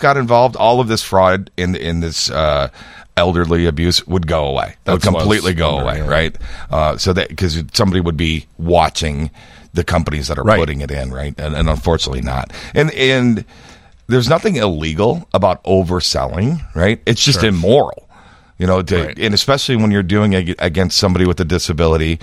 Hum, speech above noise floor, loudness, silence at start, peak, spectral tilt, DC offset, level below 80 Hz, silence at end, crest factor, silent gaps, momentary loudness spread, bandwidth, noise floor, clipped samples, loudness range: none; 29 dB; -15 LUFS; 0 s; 0 dBFS; -5 dB/octave; under 0.1%; -28 dBFS; 0.05 s; 16 dB; none; 8 LU; 15 kHz; -44 dBFS; under 0.1%; 3 LU